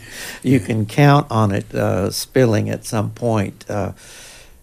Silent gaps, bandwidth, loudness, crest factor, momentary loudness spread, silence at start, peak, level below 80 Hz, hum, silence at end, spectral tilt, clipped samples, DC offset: none; 16 kHz; -18 LUFS; 16 dB; 15 LU; 0 s; -2 dBFS; -46 dBFS; none; 0.25 s; -6.5 dB/octave; under 0.1%; under 0.1%